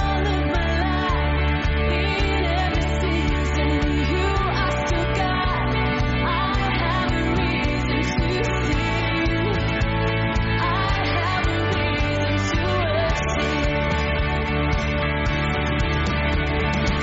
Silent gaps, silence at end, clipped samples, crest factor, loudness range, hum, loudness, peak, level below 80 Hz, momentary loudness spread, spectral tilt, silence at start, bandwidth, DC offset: none; 0 s; under 0.1%; 10 dB; 0 LU; none; -22 LUFS; -10 dBFS; -28 dBFS; 1 LU; -4.5 dB/octave; 0 s; 8 kHz; under 0.1%